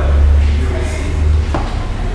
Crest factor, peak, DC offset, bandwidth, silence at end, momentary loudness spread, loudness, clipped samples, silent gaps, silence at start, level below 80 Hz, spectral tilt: 12 dB; -2 dBFS; under 0.1%; 10.5 kHz; 0 s; 8 LU; -16 LUFS; under 0.1%; none; 0 s; -14 dBFS; -7 dB/octave